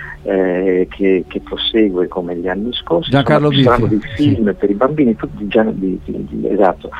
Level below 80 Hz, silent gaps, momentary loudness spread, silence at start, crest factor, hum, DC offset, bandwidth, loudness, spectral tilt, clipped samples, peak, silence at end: -36 dBFS; none; 9 LU; 0 s; 14 dB; none; under 0.1%; 9.4 kHz; -15 LUFS; -8 dB/octave; under 0.1%; 0 dBFS; 0 s